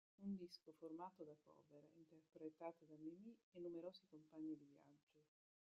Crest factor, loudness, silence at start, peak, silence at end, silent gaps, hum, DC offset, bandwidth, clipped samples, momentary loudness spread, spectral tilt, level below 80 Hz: 18 dB; -58 LUFS; 0.2 s; -40 dBFS; 0.5 s; 3.43-3.52 s, 5.03-5.07 s; none; under 0.1%; 7.2 kHz; under 0.1%; 10 LU; -6.5 dB/octave; under -90 dBFS